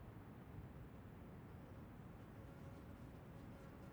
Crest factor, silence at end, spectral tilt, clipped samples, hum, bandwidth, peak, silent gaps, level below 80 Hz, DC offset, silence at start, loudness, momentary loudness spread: 12 dB; 0 s; -7.5 dB/octave; under 0.1%; none; over 20 kHz; -44 dBFS; none; -66 dBFS; under 0.1%; 0 s; -58 LUFS; 1 LU